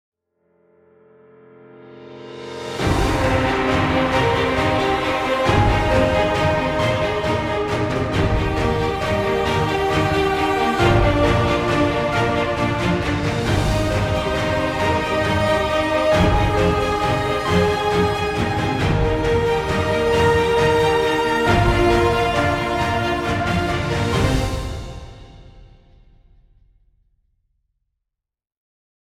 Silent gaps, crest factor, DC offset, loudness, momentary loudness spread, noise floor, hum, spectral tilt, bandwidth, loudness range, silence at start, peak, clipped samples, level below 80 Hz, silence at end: none; 16 dB; under 0.1%; -19 LUFS; 5 LU; -82 dBFS; none; -6 dB/octave; 15.5 kHz; 6 LU; 1.75 s; -2 dBFS; under 0.1%; -30 dBFS; 3.4 s